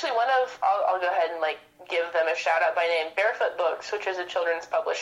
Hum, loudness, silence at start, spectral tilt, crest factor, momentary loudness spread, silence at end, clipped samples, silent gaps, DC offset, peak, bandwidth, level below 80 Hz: none; -26 LUFS; 0 s; -1 dB/octave; 14 dB; 6 LU; 0 s; under 0.1%; none; under 0.1%; -12 dBFS; 11.5 kHz; -74 dBFS